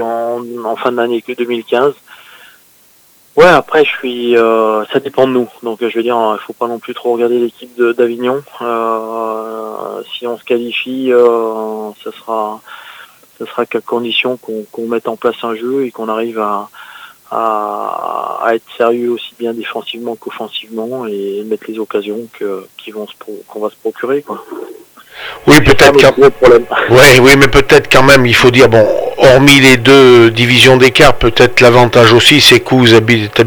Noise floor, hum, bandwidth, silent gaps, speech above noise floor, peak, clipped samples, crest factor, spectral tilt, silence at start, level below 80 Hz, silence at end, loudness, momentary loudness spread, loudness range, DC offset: -47 dBFS; none; over 20 kHz; none; 37 dB; 0 dBFS; 2%; 10 dB; -4.5 dB/octave; 0 s; -34 dBFS; 0 s; -9 LUFS; 18 LU; 15 LU; under 0.1%